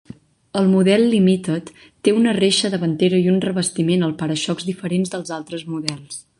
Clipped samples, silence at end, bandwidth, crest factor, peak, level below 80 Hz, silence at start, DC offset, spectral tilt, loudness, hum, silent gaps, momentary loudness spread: under 0.1%; 0.2 s; 11.5 kHz; 18 dB; -2 dBFS; -60 dBFS; 0.55 s; under 0.1%; -5.5 dB/octave; -19 LUFS; none; none; 12 LU